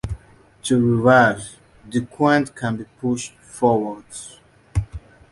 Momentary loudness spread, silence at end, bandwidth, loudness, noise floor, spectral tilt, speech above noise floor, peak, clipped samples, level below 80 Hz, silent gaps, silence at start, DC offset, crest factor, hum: 21 LU; 0.35 s; 11.5 kHz; -20 LUFS; -47 dBFS; -6 dB/octave; 28 dB; -2 dBFS; under 0.1%; -40 dBFS; none; 0.05 s; under 0.1%; 20 dB; none